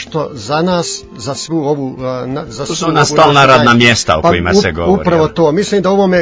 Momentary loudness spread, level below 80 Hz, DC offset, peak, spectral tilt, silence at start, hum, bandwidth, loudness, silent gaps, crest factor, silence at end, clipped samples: 14 LU; -34 dBFS; under 0.1%; 0 dBFS; -4.5 dB/octave; 0 s; none; 8 kHz; -11 LUFS; none; 12 dB; 0 s; 0.5%